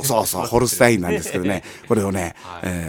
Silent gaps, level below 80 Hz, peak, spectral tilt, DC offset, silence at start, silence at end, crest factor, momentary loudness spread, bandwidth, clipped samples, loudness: none; -44 dBFS; 0 dBFS; -4.5 dB/octave; under 0.1%; 0 s; 0 s; 20 dB; 12 LU; 17.5 kHz; under 0.1%; -20 LUFS